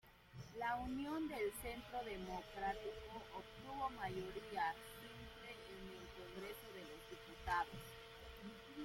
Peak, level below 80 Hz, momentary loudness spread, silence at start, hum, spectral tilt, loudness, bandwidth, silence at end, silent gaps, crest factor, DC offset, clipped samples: -28 dBFS; -64 dBFS; 12 LU; 0.05 s; none; -4.5 dB/octave; -48 LUFS; 16.5 kHz; 0 s; none; 20 dB; under 0.1%; under 0.1%